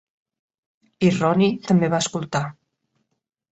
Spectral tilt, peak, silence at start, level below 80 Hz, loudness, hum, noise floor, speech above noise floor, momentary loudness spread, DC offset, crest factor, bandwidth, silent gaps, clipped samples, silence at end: -5.5 dB/octave; -4 dBFS; 1 s; -60 dBFS; -21 LUFS; none; -72 dBFS; 53 dB; 8 LU; under 0.1%; 18 dB; 8.2 kHz; none; under 0.1%; 1 s